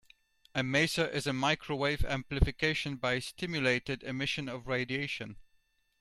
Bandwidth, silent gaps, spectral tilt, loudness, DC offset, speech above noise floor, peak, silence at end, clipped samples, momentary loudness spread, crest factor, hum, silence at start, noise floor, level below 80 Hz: 14.5 kHz; none; -4.5 dB/octave; -32 LUFS; under 0.1%; 40 dB; -10 dBFS; 0.6 s; under 0.1%; 7 LU; 22 dB; none; 0.55 s; -72 dBFS; -42 dBFS